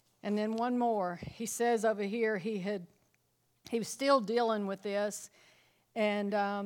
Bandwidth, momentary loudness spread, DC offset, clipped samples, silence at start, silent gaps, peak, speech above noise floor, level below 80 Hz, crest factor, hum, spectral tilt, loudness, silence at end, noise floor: 17.5 kHz; 10 LU; under 0.1%; under 0.1%; 0.25 s; none; -14 dBFS; 43 dB; -72 dBFS; 18 dB; none; -4.5 dB/octave; -33 LUFS; 0 s; -75 dBFS